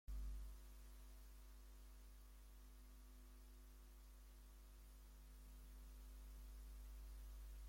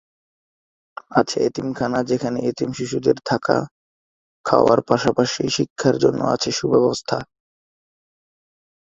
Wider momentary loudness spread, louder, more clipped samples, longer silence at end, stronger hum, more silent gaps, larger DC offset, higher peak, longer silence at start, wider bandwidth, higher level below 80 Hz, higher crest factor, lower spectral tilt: about the same, 6 LU vs 8 LU; second, -62 LUFS vs -20 LUFS; neither; second, 0 s vs 1.75 s; neither; second, none vs 3.71-4.44 s, 5.70-5.76 s; neither; second, -44 dBFS vs 0 dBFS; second, 0.05 s vs 1.1 s; first, 16.5 kHz vs 8.2 kHz; about the same, -58 dBFS vs -56 dBFS; second, 14 dB vs 20 dB; about the same, -4.5 dB/octave vs -5 dB/octave